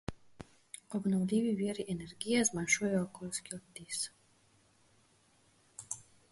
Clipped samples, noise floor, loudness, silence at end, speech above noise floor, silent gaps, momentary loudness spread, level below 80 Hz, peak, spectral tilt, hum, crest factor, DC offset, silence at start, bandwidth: under 0.1%; -69 dBFS; -35 LUFS; 0.3 s; 34 dB; none; 21 LU; -64 dBFS; -14 dBFS; -4 dB/octave; none; 22 dB; under 0.1%; 0.1 s; 11.5 kHz